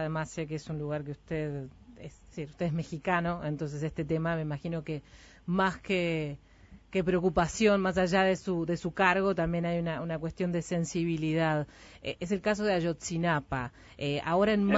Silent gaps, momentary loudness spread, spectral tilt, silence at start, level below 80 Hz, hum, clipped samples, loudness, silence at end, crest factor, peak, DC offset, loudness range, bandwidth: none; 14 LU; -6 dB/octave; 0 s; -52 dBFS; none; under 0.1%; -31 LUFS; 0 s; 20 dB; -10 dBFS; under 0.1%; 6 LU; 8 kHz